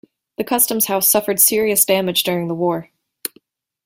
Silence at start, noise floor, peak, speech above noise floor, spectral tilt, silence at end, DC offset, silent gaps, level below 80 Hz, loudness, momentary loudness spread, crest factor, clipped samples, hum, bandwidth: 0.4 s; -55 dBFS; 0 dBFS; 38 dB; -2.5 dB/octave; 0.6 s; under 0.1%; none; -60 dBFS; -15 LUFS; 17 LU; 18 dB; under 0.1%; none; 16.5 kHz